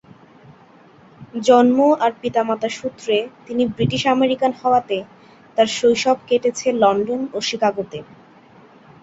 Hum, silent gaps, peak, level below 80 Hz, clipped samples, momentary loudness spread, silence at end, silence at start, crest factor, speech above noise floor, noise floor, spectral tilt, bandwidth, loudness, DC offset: none; none; -2 dBFS; -58 dBFS; under 0.1%; 12 LU; 1 s; 1.2 s; 18 dB; 30 dB; -48 dBFS; -5 dB/octave; 8 kHz; -18 LUFS; under 0.1%